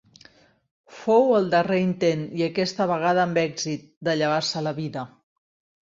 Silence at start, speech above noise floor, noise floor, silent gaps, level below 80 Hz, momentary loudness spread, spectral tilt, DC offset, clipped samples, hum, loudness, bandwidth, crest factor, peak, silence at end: 0.9 s; 32 dB; -55 dBFS; 3.97-4.01 s; -66 dBFS; 11 LU; -5.5 dB/octave; under 0.1%; under 0.1%; none; -23 LUFS; 7.8 kHz; 16 dB; -8 dBFS; 0.8 s